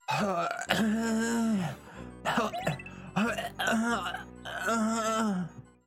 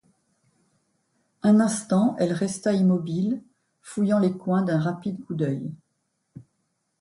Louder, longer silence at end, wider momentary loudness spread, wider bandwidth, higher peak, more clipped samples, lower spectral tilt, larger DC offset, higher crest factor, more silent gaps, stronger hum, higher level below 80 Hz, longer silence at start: second, -31 LUFS vs -24 LUFS; second, 0.25 s vs 0.6 s; about the same, 11 LU vs 11 LU; first, 16 kHz vs 11.5 kHz; about the same, -8 dBFS vs -10 dBFS; neither; second, -4.5 dB/octave vs -7 dB/octave; neither; first, 24 dB vs 16 dB; neither; neither; first, -58 dBFS vs -68 dBFS; second, 0.1 s vs 1.45 s